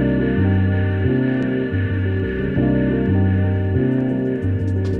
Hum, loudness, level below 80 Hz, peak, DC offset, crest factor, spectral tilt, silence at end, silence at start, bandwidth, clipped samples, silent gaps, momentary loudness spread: none; -19 LUFS; -36 dBFS; -6 dBFS; under 0.1%; 12 dB; -10 dB/octave; 0 s; 0 s; 4.3 kHz; under 0.1%; none; 4 LU